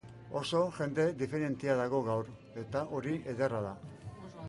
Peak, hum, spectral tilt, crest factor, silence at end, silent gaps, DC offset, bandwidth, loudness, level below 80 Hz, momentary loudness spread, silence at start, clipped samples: -18 dBFS; none; -6.5 dB/octave; 16 dB; 0 s; none; under 0.1%; 11.5 kHz; -34 LUFS; -64 dBFS; 14 LU; 0.05 s; under 0.1%